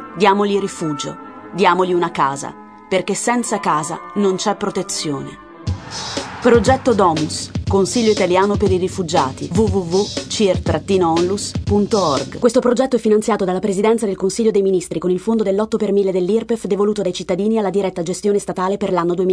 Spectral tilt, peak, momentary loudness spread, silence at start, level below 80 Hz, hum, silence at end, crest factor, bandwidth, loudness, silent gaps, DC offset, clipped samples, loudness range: -5 dB/octave; 0 dBFS; 8 LU; 0 s; -40 dBFS; none; 0 s; 18 dB; 11 kHz; -17 LUFS; none; under 0.1%; under 0.1%; 3 LU